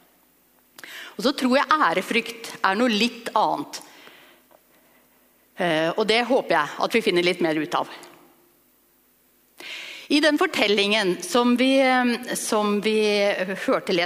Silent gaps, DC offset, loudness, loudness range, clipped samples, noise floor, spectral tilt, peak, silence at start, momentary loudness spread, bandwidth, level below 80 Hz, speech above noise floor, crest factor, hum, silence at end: none; under 0.1%; -21 LUFS; 6 LU; under 0.1%; -61 dBFS; -3.5 dB/octave; -2 dBFS; 0.85 s; 16 LU; 15.5 kHz; -70 dBFS; 39 dB; 20 dB; none; 0 s